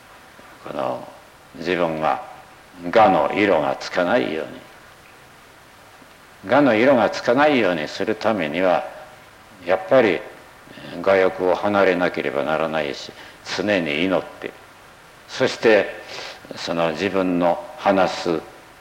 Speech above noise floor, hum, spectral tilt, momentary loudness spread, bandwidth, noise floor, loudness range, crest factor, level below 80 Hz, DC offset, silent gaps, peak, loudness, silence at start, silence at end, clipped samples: 27 dB; none; -5.5 dB/octave; 18 LU; 16.5 kHz; -47 dBFS; 4 LU; 16 dB; -58 dBFS; under 0.1%; none; -4 dBFS; -20 LUFS; 0.5 s; 0.2 s; under 0.1%